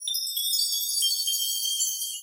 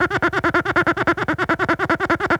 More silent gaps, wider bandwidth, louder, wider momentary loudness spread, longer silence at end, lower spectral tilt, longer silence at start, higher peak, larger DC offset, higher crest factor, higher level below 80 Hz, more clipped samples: neither; first, 17 kHz vs 14.5 kHz; second, -24 LUFS vs -19 LUFS; about the same, 3 LU vs 2 LU; about the same, 0 s vs 0 s; second, 10 dB/octave vs -6 dB/octave; about the same, 0 s vs 0 s; second, -14 dBFS vs -4 dBFS; neither; about the same, 14 dB vs 16 dB; second, under -90 dBFS vs -44 dBFS; neither